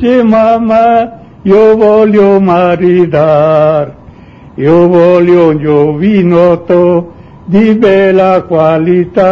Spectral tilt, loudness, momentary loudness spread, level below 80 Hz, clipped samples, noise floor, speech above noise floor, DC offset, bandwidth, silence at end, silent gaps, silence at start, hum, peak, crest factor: -9 dB/octave; -7 LUFS; 6 LU; -40 dBFS; 1%; -33 dBFS; 27 dB; under 0.1%; 6.8 kHz; 0 s; none; 0 s; none; 0 dBFS; 6 dB